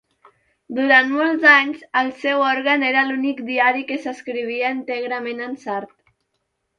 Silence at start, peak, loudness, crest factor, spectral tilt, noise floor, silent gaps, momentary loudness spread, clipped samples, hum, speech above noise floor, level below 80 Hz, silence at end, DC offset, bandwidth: 0.7 s; -2 dBFS; -18 LUFS; 18 dB; -3.5 dB/octave; -73 dBFS; none; 14 LU; under 0.1%; none; 54 dB; -72 dBFS; 0.95 s; under 0.1%; 7.4 kHz